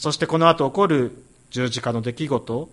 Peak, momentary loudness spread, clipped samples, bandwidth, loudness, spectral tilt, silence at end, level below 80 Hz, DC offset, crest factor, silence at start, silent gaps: -2 dBFS; 9 LU; under 0.1%; 11.5 kHz; -21 LUFS; -5.5 dB/octave; 0.05 s; -56 dBFS; under 0.1%; 20 dB; 0 s; none